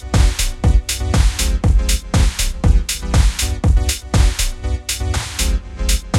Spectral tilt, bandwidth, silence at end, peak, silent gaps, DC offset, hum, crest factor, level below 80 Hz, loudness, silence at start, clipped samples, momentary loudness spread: -4 dB/octave; 16.5 kHz; 0 s; 0 dBFS; none; under 0.1%; none; 14 dB; -16 dBFS; -18 LUFS; 0 s; under 0.1%; 5 LU